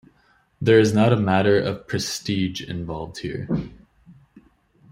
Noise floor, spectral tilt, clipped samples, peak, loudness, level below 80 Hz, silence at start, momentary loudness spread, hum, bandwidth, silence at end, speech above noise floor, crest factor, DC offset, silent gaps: -61 dBFS; -6 dB/octave; under 0.1%; -4 dBFS; -22 LUFS; -52 dBFS; 0.6 s; 14 LU; none; 16 kHz; 0.8 s; 40 dB; 20 dB; under 0.1%; none